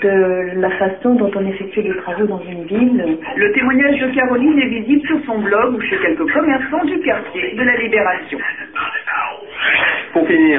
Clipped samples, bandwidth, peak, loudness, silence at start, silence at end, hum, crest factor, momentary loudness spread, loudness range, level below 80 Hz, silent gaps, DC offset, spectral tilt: under 0.1%; 3.8 kHz; -2 dBFS; -16 LUFS; 0 s; 0 s; none; 14 dB; 8 LU; 2 LU; -52 dBFS; none; 0.3%; -9.5 dB/octave